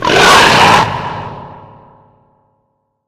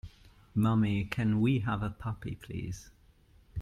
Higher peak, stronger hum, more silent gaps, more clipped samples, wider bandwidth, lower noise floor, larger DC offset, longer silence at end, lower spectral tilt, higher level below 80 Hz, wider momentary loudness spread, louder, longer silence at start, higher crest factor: first, 0 dBFS vs -14 dBFS; first, 60 Hz at -45 dBFS vs none; neither; first, 0.4% vs under 0.1%; first, over 20 kHz vs 13 kHz; about the same, -64 dBFS vs -61 dBFS; neither; first, 1.5 s vs 0 s; second, -3 dB/octave vs -7.5 dB/octave; first, -38 dBFS vs -52 dBFS; first, 22 LU vs 15 LU; first, -7 LUFS vs -32 LUFS; about the same, 0 s vs 0.05 s; second, 12 dB vs 18 dB